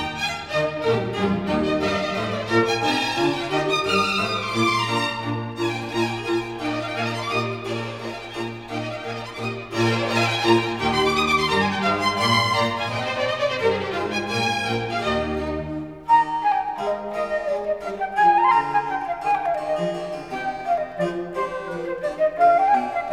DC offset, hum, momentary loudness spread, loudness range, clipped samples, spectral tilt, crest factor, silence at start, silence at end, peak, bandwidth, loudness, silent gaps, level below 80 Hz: 0.1%; none; 10 LU; 6 LU; under 0.1%; -4.5 dB/octave; 18 dB; 0 s; 0 s; -4 dBFS; 17 kHz; -22 LUFS; none; -50 dBFS